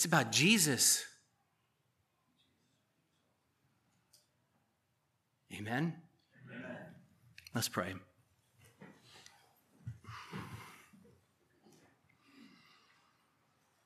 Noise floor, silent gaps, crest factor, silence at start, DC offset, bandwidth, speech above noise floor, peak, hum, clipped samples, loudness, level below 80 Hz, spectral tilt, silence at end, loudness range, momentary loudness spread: -80 dBFS; none; 28 dB; 0 s; under 0.1%; 14.5 kHz; 48 dB; -14 dBFS; none; under 0.1%; -32 LUFS; -80 dBFS; -2.5 dB/octave; 3.1 s; 20 LU; 26 LU